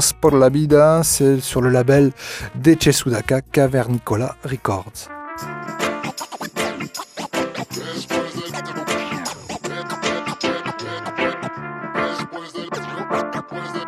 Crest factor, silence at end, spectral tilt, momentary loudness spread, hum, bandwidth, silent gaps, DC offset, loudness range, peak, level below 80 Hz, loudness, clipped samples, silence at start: 20 dB; 0 s; -5 dB/octave; 15 LU; none; 15.5 kHz; none; under 0.1%; 10 LU; 0 dBFS; -46 dBFS; -20 LUFS; under 0.1%; 0 s